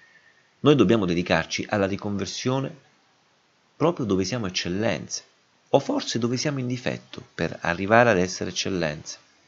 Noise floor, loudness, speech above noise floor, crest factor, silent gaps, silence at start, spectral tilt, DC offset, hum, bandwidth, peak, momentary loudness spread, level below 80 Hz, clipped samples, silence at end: -63 dBFS; -24 LUFS; 40 dB; 24 dB; none; 0.65 s; -5 dB/octave; under 0.1%; none; 7.8 kHz; 0 dBFS; 12 LU; -58 dBFS; under 0.1%; 0.3 s